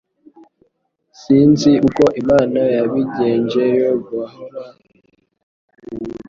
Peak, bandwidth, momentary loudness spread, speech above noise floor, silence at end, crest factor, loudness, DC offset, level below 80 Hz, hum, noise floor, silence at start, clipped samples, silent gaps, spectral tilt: -2 dBFS; 7.4 kHz; 18 LU; 51 dB; 0.05 s; 16 dB; -15 LUFS; under 0.1%; -50 dBFS; none; -66 dBFS; 1.2 s; under 0.1%; 5.43-5.68 s; -7 dB/octave